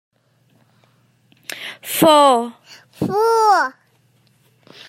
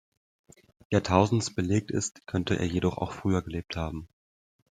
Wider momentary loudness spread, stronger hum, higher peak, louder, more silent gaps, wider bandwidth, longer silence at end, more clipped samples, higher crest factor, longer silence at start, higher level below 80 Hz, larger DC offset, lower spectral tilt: first, 19 LU vs 11 LU; neither; about the same, -2 dBFS vs -4 dBFS; first, -15 LUFS vs -28 LUFS; neither; first, 16 kHz vs 9.6 kHz; first, 1.2 s vs 0.65 s; neither; second, 18 dB vs 24 dB; first, 1.5 s vs 0.9 s; second, -66 dBFS vs -52 dBFS; neither; second, -3.5 dB/octave vs -5.5 dB/octave